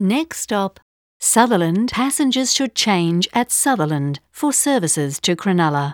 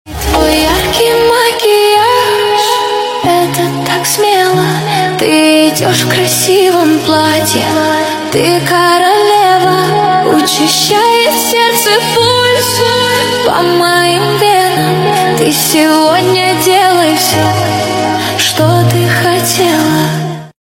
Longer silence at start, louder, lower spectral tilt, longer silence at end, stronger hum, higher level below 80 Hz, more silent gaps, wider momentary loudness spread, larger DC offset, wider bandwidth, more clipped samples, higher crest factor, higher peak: about the same, 0 s vs 0.05 s; second, -18 LUFS vs -9 LUFS; about the same, -3.5 dB/octave vs -3.5 dB/octave; about the same, 0 s vs 0.1 s; neither; second, -58 dBFS vs -34 dBFS; first, 0.82-1.20 s vs none; about the same, 6 LU vs 4 LU; neither; first, over 20 kHz vs 17 kHz; second, under 0.1% vs 0.3%; first, 18 dB vs 10 dB; about the same, 0 dBFS vs 0 dBFS